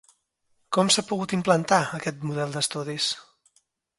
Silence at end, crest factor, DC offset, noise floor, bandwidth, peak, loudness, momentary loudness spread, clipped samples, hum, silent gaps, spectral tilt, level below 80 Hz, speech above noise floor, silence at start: 0.75 s; 22 dB; under 0.1%; -70 dBFS; 11.5 kHz; -4 dBFS; -25 LUFS; 9 LU; under 0.1%; none; none; -3.5 dB/octave; -68 dBFS; 46 dB; 0.7 s